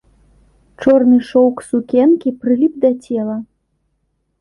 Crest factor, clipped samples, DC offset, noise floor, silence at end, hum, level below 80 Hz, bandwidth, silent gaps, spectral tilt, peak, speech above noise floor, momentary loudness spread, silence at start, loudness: 16 dB; under 0.1%; under 0.1%; -67 dBFS; 0.95 s; none; -54 dBFS; 11 kHz; none; -7 dB/octave; 0 dBFS; 53 dB; 9 LU; 0.8 s; -14 LUFS